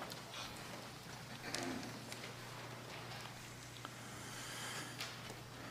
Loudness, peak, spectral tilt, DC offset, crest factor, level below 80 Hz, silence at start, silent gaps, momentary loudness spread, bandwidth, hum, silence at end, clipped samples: -47 LUFS; -20 dBFS; -3 dB/octave; under 0.1%; 28 dB; -72 dBFS; 0 s; none; 6 LU; 15.5 kHz; none; 0 s; under 0.1%